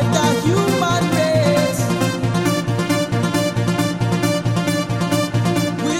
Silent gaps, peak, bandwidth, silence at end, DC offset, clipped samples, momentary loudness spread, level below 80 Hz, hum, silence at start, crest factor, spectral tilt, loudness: none; -4 dBFS; 17 kHz; 0 s; under 0.1%; under 0.1%; 3 LU; -46 dBFS; none; 0 s; 14 dB; -5.5 dB/octave; -18 LUFS